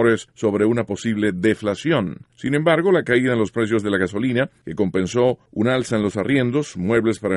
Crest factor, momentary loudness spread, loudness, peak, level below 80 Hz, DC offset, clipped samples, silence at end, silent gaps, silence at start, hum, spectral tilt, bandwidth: 16 dB; 6 LU; -20 LUFS; -4 dBFS; -54 dBFS; under 0.1%; under 0.1%; 0 s; none; 0 s; none; -6.5 dB/octave; 11.5 kHz